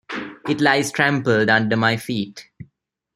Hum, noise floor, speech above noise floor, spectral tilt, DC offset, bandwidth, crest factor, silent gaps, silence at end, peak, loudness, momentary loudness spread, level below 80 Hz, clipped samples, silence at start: none; -65 dBFS; 47 dB; -5 dB/octave; under 0.1%; 16 kHz; 20 dB; none; 0.5 s; 0 dBFS; -19 LUFS; 14 LU; -60 dBFS; under 0.1%; 0.1 s